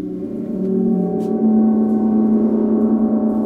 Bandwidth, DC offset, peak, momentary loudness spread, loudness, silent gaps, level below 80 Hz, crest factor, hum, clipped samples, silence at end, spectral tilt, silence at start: 2 kHz; under 0.1%; -6 dBFS; 8 LU; -17 LUFS; none; -50 dBFS; 10 dB; none; under 0.1%; 0 s; -11.5 dB/octave; 0 s